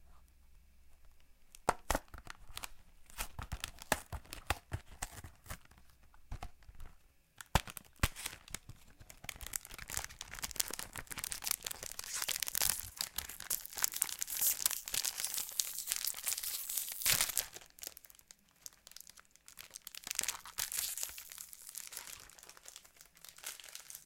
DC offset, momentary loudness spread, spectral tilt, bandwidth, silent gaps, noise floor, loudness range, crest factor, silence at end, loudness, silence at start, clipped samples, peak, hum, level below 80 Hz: under 0.1%; 20 LU; -1 dB/octave; 17 kHz; none; -63 dBFS; 10 LU; 36 dB; 0 s; -38 LUFS; 0 s; under 0.1%; -4 dBFS; none; -54 dBFS